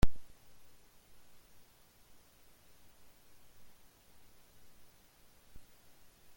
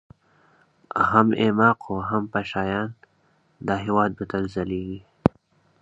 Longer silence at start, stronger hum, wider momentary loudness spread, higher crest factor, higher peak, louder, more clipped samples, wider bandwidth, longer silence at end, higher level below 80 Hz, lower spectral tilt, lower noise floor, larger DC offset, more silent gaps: second, 0.05 s vs 0.95 s; neither; second, 2 LU vs 12 LU; about the same, 26 dB vs 24 dB; second, -12 dBFS vs 0 dBFS; second, -56 LUFS vs -23 LUFS; neither; first, 17 kHz vs 7.8 kHz; first, 1.65 s vs 0.55 s; about the same, -48 dBFS vs -50 dBFS; second, -6 dB/octave vs -8 dB/octave; about the same, -63 dBFS vs -64 dBFS; neither; neither